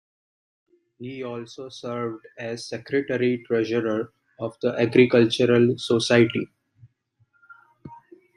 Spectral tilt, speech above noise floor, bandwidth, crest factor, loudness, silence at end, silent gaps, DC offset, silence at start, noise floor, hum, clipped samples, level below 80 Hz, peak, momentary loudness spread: -6 dB/octave; 44 dB; 11 kHz; 20 dB; -23 LUFS; 0.4 s; none; under 0.1%; 1 s; -66 dBFS; none; under 0.1%; -66 dBFS; -4 dBFS; 17 LU